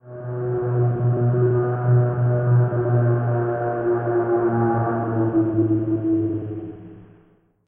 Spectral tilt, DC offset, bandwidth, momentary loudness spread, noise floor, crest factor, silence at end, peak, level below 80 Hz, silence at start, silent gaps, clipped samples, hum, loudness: -15 dB/octave; under 0.1%; 2.5 kHz; 8 LU; -57 dBFS; 12 dB; 0.65 s; -8 dBFS; -52 dBFS; 0.05 s; none; under 0.1%; none; -21 LUFS